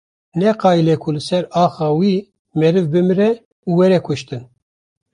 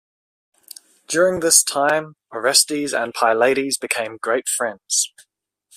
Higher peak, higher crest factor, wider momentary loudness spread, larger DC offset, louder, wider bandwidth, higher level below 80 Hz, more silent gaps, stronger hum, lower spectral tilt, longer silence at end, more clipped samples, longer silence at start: about the same, -2 dBFS vs 0 dBFS; second, 14 dB vs 20 dB; about the same, 11 LU vs 10 LU; neither; about the same, -16 LUFS vs -18 LUFS; second, 10.5 kHz vs 16 kHz; first, -56 dBFS vs -64 dBFS; first, 2.39-2.45 s, 3.45-3.63 s vs none; neither; first, -7.5 dB/octave vs -1 dB/octave; about the same, 0.7 s vs 0.7 s; neither; second, 0.35 s vs 1.1 s